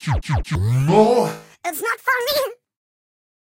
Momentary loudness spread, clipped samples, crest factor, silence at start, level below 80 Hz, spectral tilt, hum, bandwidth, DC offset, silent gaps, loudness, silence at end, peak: 12 LU; under 0.1%; 16 dB; 0 s; -36 dBFS; -5.5 dB/octave; none; 16.5 kHz; under 0.1%; none; -19 LUFS; 0.95 s; -4 dBFS